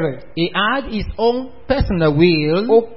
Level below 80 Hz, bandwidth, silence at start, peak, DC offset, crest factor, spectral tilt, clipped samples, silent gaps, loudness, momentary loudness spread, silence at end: -32 dBFS; 5.8 kHz; 0 s; -2 dBFS; 2%; 16 dB; -11.5 dB/octave; under 0.1%; none; -17 LUFS; 9 LU; 0 s